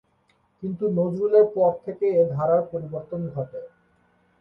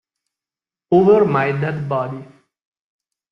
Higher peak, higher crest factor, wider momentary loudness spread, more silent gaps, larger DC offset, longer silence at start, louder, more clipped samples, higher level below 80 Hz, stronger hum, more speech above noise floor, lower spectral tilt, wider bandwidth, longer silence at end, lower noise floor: second, -6 dBFS vs -2 dBFS; about the same, 18 dB vs 18 dB; about the same, 15 LU vs 13 LU; neither; neither; second, 0.6 s vs 0.9 s; second, -23 LUFS vs -16 LUFS; neither; second, -64 dBFS vs -56 dBFS; neither; second, 43 dB vs over 74 dB; first, -11.5 dB/octave vs -9.5 dB/octave; second, 4.4 kHz vs 6 kHz; second, 0.75 s vs 1.05 s; second, -66 dBFS vs under -90 dBFS